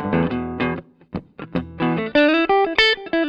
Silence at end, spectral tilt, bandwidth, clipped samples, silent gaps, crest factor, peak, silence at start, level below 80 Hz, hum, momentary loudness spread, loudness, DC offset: 0 s; -6 dB/octave; 8.8 kHz; under 0.1%; none; 18 dB; -2 dBFS; 0 s; -46 dBFS; none; 17 LU; -19 LUFS; under 0.1%